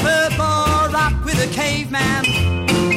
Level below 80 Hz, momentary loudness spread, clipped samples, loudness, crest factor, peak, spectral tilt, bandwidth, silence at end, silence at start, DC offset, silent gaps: -30 dBFS; 3 LU; under 0.1%; -17 LUFS; 14 dB; -4 dBFS; -4.5 dB/octave; 16.5 kHz; 0 s; 0 s; under 0.1%; none